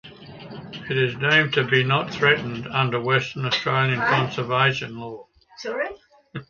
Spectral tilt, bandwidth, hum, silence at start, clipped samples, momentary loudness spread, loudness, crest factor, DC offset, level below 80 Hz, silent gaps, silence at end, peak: -5.5 dB/octave; 7.2 kHz; none; 0.05 s; under 0.1%; 19 LU; -21 LUFS; 20 dB; under 0.1%; -58 dBFS; none; 0.05 s; -2 dBFS